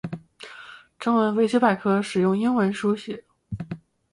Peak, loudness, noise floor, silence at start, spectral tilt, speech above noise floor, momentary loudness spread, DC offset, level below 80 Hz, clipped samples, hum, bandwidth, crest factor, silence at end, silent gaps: -6 dBFS; -22 LUFS; -45 dBFS; 0.05 s; -6.5 dB/octave; 24 dB; 20 LU; under 0.1%; -58 dBFS; under 0.1%; none; 11 kHz; 18 dB; 0.35 s; none